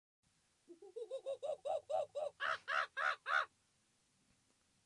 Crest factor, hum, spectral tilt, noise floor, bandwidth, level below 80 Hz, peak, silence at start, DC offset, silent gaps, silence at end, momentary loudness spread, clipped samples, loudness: 20 dB; none; -1 dB/octave; -78 dBFS; 11 kHz; under -90 dBFS; -24 dBFS; 0.7 s; under 0.1%; none; 1.4 s; 11 LU; under 0.1%; -41 LUFS